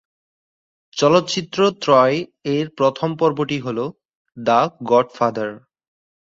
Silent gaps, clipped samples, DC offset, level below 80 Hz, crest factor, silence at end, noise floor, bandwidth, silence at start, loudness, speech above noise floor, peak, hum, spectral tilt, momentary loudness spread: 4.15-4.25 s; under 0.1%; under 0.1%; -62 dBFS; 18 dB; 0.7 s; under -90 dBFS; 7.8 kHz; 0.95 s; -19 LUFS; over 72 dB; -2 dBFS; none; -5.5 dB/octave; 11 LU